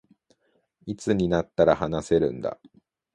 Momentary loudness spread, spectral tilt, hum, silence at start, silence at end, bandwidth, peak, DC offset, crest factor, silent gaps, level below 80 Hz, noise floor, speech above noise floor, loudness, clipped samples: 16 LU; -6.5 dB/octave; none; 0.85 s; 0.6 s; 11.5 kHz; -6 dBFS; under 0.1%; 20 dB; none; -50 dBFS; -69 dBFS; 45 dB; -24 LUFS; under 0.1%